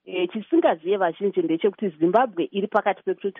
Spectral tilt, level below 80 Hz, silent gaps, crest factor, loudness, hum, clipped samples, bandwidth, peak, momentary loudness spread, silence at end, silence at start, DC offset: -4.5 dB/octave; -76 dBFS; none; 18 dB; -23 LUFS; none; under 0.1%; 3.8 kHz; -6 dBFS; 6 LU; 0.1 s; 0.05 s; under 0.1%